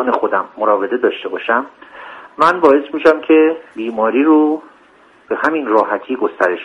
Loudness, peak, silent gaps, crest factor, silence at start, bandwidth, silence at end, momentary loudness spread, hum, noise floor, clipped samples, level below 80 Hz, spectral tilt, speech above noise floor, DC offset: -15 LUFS; 0 dBFS; none; 16 dB; 0 s; 9 kHz; 0 s; 13 LU; none; -48 dBFS; under 0.1%; -60 dBFS; -6 dB/octave; 33 dB; under 0.1%